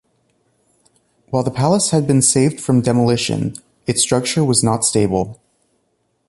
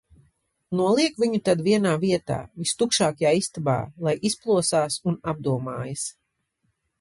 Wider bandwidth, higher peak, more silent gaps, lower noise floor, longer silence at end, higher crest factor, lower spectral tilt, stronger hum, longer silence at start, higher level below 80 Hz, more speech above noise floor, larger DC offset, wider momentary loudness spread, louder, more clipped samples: about the same, 12 kHz vs 11.5 kHz; first, 0 dBFS vs -8 dBFS; neither; second, -66 dBFS vs -75 dBFS; about the same, 0.95 s vs 0.9 s; about the same, 18 dB vs 16 dB; about the same, -4.5 dB/octave vs -4.5 dB/octave; neither; first, 1.3 s vs 0.7 s; first, -48 dBFS vs -58 dBFS; about the same, 50 dB vs 51 dB; neither; about the same, 9 LU vs 9 LU; first, -16 LUFS vs -24 LUFS; neither